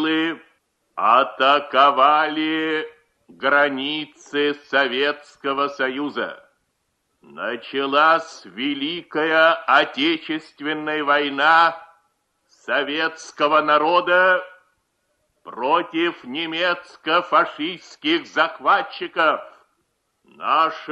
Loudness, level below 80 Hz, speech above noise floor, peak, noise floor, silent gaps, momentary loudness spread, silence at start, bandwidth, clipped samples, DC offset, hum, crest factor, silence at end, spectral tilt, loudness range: -20 LUFS; -74 dBFS; 52 dB; -2 dBFS; -72 dBFS; none; 12 LU; 0 s; 9.4 kHz; under 0.1%; under 0.1%; none; 18 dB; 0 s; -4 dB/octave; 5 LU